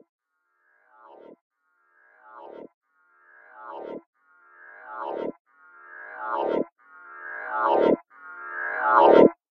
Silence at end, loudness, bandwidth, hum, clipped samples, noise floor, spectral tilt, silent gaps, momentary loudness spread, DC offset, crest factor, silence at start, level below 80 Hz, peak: 0.15 s; -23 LUFS; 6 kHz; none; under 0.1%; -72 dBFS; -8 dB/octave; 2.74-2.81 s, 4.06-4.13 s, 5.40-5.45 s, 6.72-6.76 s; 28 LU; under 0.1%; 24 dB; 2.35 s; -70 dBFS; -2 dBFS